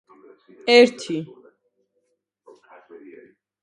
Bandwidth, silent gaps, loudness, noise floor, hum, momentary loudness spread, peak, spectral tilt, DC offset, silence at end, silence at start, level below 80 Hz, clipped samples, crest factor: 10.5 kHz; none; -18 LUFS; -73 dBFS; none; 17 LU; 0 dBFS; -4 dB/octave; under 0.1%; 2.4 s; 0.65 s; -76 dBFS; under 0.1%; 24 dB